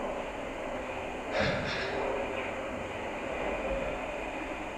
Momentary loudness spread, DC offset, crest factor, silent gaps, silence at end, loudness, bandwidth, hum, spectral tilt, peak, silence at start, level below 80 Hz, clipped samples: 6 LU; under 0.1%; 16 dB; none; 0 s; -34 LUFS; 13.5 kHz; none; -5 dB/octave; -18 dBFS; 0 s; -48 dBFS; under 0.1%